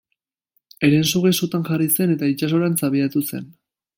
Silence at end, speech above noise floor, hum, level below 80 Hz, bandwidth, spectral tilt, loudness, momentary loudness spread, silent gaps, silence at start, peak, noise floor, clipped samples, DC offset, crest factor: 0.45 s; 58 dB; none; -60 dBFS; 17 kHz; -5 dB/octave; -19 LUFS; 6 LU; none; 0.8 s; -4 dBFS; -77 dBFS; under 0.1%; under 0.1%; 18 dB